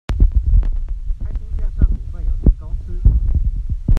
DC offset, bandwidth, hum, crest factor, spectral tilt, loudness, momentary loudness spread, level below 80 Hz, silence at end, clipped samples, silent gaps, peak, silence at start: under 0.1%; 3.6 kHz; none; 16 dB; -9.5 dB/octave; -21 LUFS; 10 LU; -16 dBFS; 0 s; under 0.1%; none; 0 dBFS; 0.1 s